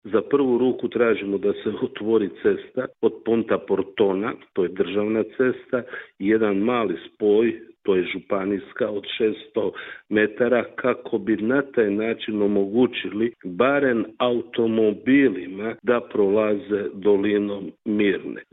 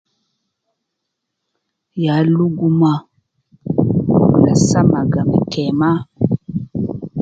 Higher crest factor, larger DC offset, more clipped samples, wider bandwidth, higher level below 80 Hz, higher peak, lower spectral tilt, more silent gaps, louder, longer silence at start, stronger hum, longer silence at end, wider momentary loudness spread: about the same, 18 dB vs 16 dB; neither; neither; second, 4 kHz vs 9.2 kHz; second, -62 dBFS vs -44 dBFS; second, -4 dBFS vs 0 dBFS; second, -4.5 dB/octave vs -7 dB/octave; neither; second, -23 LUFS vs -16 LUFS; second, 0.05 s vs 1.95 s; neither; about the same, 0.1 s vs 0 s; second, 8 LU vs 11 LU